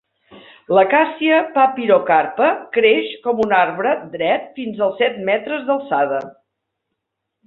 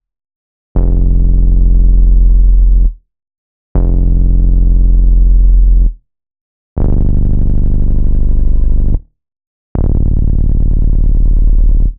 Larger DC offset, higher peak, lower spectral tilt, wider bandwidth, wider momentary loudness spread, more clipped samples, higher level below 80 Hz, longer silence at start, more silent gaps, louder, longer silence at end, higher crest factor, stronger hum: neither; about the same, -2 dBFS vs 0 dBFS; second, -7 dB/octave vs -14 dB/octave; first, 4.8 kHz vs 1.2 kHz; about the same, 7 LU vs 7 LU; neither; second, -64 dBFS vs -8 dBFS; second, 0.3 s vs 0.75 s; second, none vs 3.38-3.75 s, 6.41-6.76 s, 9.47-9.75 s; second, -17 LUFS vs -14 LUFS; first, 1.15 s vs 0.05 s; first, 16 dB vs 8 dB; neither